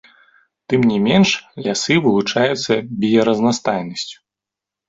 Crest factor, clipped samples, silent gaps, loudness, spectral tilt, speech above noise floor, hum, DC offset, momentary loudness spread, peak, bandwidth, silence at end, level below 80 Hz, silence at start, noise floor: 16 dB; under 0.1%; none; -17 LUFS; -5 dB/octave; 69 dB; none; under 0.1%; 8 LU; -2 dBFS; 7.8 kHz; 0.75 s; -54 dBFS; 0.7 s; -86 dBFS